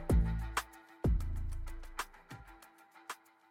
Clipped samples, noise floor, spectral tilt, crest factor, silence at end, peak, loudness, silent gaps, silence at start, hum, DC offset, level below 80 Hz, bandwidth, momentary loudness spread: under 0.1%; -60 dBFS; -6 dB/octave; 16 dB; 0.35 s; -20 dBFS; -39 LUFS; none; 0 s; none; under 0.1%; -38 dBFS; 16 kHz; 20 LU